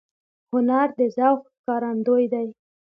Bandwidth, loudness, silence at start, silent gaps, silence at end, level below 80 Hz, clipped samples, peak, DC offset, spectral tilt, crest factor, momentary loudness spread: 6 kHz; -22 LUFS; 0.55 s; 1.59-1.64 s; 0.45 s; -76 dBFS; under 0.1%; -6 dBFS; under 0.1%; -8.5 dB/octave; 18 dB; 8 LU